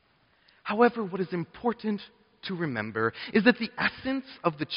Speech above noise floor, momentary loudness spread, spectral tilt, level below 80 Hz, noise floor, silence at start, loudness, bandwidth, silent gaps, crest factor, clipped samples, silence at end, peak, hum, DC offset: 37 dB; 10 LU; -4 dB/octave; -66 dBFS; -65 dBFS; 0.65 s; -28 LUFS; 5.4 kHz; none; 24 dB; under 0.1%; 0 s; -4 dBFS; none; under 0.1%